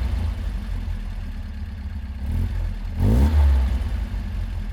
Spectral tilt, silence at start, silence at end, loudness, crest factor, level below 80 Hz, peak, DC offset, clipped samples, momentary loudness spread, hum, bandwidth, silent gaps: -8 dB/octave; 0 s; 0 s; -25 LUFS; 14 dB; -24 dBFS; -10 dBFS; under 0.1%; under 0.1%; 15 LU; none; 12 kHz; none